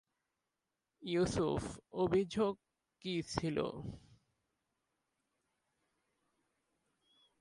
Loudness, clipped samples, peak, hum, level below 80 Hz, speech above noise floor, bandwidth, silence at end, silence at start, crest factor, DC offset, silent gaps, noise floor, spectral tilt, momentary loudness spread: -37 LUFS; under 0.1%; -18 dBFS; none; -62 dBFS; 53 dB; 11.5 kHz; 3.4 s; 1 s; 22 dB; under 0.1%; none; -89 dBFS; -6 dB/octave; 16 LU